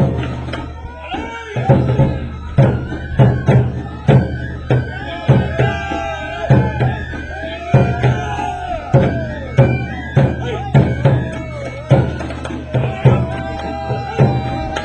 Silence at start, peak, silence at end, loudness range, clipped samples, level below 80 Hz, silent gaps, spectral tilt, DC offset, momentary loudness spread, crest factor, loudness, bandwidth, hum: 0 s; 0 dBFS; 0 s; 2 LU; under 0.1%; -30 dBFS; none; -8 dB/octave; under 0.1%; 11 LU; 16 dB; -17 LUFS; 8.2 kHz; none